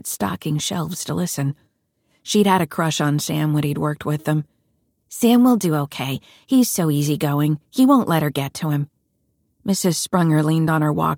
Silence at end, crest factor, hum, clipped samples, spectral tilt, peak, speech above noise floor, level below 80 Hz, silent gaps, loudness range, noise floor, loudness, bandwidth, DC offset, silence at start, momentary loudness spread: 0 s; 16 dB; none; under 0.1%; -5.5 dB/octave; -4 dBFS; 49 dB; -58 dBFS; none; 3 LU; -68 dBFS; -20 LUFS; 18 kHz; under 0.1%; 0.05 s; 10 LU